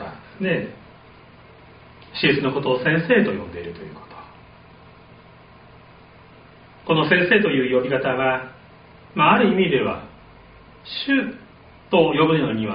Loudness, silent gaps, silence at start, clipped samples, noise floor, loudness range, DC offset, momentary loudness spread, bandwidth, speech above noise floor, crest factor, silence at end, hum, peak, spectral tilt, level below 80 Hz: -20 LUFS; none; 0 s; under 0.1%; -47 dBFS; 7 LU; under 0.1%; 21 LU; 5.2 kHz; 28 dB; 20 dB; 0 s; none; -2 dBFS; -3.5 dB/octave; -54 dBFS